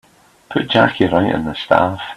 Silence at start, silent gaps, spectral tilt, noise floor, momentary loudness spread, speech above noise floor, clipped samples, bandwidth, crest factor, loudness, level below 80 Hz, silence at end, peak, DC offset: 0.5 s; none; -7 dB/octave; -39 dBFS; 8 LU; 24 dB; under 0.1%; 13 kHz; 16 dB; -16 LUFS; -48 dBFS; 0 s; 0 dBFS; under 0.1%